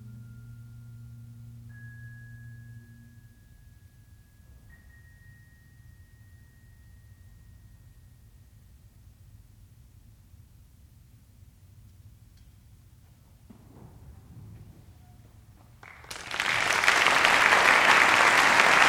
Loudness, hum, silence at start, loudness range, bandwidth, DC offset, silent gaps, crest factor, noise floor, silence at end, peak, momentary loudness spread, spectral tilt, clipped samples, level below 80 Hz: -20 LUFS; none; 0.05 s; 30 LU; over 20 kHz; under 0.1%; none; 26 dB; -55 dBFS; 0 s; -4 dBFS; 29 LU; -1.5 dB/octave; under 0.1%; -58 dBFS